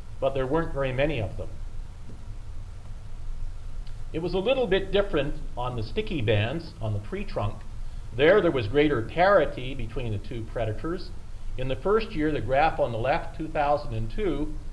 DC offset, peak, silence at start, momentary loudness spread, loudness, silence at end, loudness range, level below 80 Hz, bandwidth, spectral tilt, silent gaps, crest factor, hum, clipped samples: under 0.1%; -8 dBFS; 0 s; 20 LU; -27 LUFS; 0 s; 8 LU; -34 dBFS; 11 kHz; -7 dB/octave; none; 18 dB; none; under 0.1%